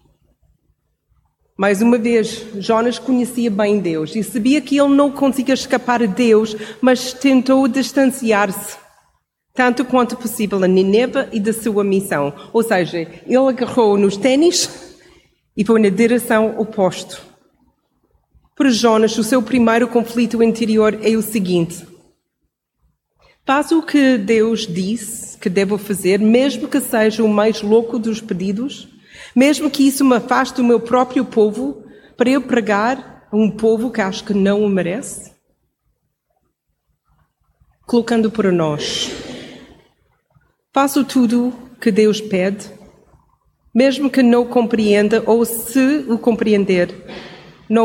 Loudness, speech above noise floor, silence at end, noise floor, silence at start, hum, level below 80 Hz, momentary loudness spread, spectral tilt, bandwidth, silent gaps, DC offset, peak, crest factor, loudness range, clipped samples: -16 LUFS; 57 dB; 0 s; -72 dBFS; 1.6 s; none; -54 dBFS; 10 LU; -5 dB/octave; 17 kHz; none; under 0.1%; -2 dBFS; 16 dB; 5 LU; under 0.1%